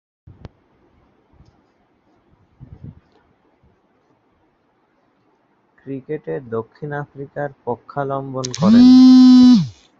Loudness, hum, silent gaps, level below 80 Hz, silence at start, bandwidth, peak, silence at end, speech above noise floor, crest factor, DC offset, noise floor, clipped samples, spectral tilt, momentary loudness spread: -12 LUFS; none; none; -54 dBFS; 2.85 s; 7.4 kHz; -2 dBFS; 0.3 s; 49 dB; 16 dB; under 0.1%; -62 dBFS; under 0.1%; -6.5 dB/octave; 21 LU